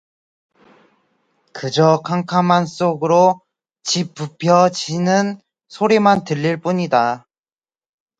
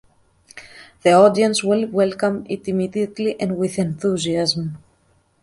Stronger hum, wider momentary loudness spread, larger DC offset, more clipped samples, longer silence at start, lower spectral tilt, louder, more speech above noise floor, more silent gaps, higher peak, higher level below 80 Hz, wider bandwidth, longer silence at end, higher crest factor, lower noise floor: neither; about the same, 13 LU vs 13 LU; neither; neither; first, 1.55 s vs 0.55 s; about the same, -5.5 dB/octave vs -5 dB/octave; about the same, -17 LUFS vs -19 LUFS; first, over 74 dB vs 42 dB; neither; about the same, 0 dBFS vs -2 dBFS; second, -62 dBFS vs -56 dBFS; second, 9 kHz vs 11.5 kHz; first, 1 s vs 0.65 s; about the same, 18 dB vs 18 dB; first, under -90 dBFS vs -60 dBFS